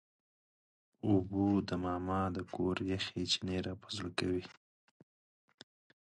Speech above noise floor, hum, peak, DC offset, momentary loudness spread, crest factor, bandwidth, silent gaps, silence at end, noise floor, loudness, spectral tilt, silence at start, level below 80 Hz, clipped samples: over 55 dB; none; -18 dBFS; under 0.1%; 8 LU; 20 dB; 11 kHz; none; 1.5 s; under -90 dBFS; -36 LUFS; -5.5 dB/octave; 1.05 s; -56 dBFS; under 0.1%